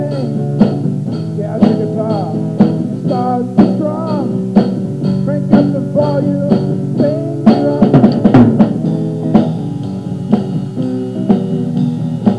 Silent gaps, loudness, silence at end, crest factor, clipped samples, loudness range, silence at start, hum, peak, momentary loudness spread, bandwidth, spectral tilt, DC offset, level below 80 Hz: none; -14 LUFS; 0 s; 12 dB; 0.6%; 4 LU; 0 s; none; 0 dBFS; 9 LU; 11 kHz; -9.5 dB/octave; 0.4%; -44 dBFS